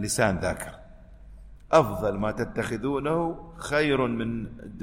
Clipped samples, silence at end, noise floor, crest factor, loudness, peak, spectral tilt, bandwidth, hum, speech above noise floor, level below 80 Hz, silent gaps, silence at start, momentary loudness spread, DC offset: under 0.1%; 0 s; -47 dBFS; 22 dB; -26 LUFS; -4 dBFS; -5 dB/octave; 16 kHz; none; 21 dB; -46 dBFS; none; 0 s; 13 LU; under 0.1%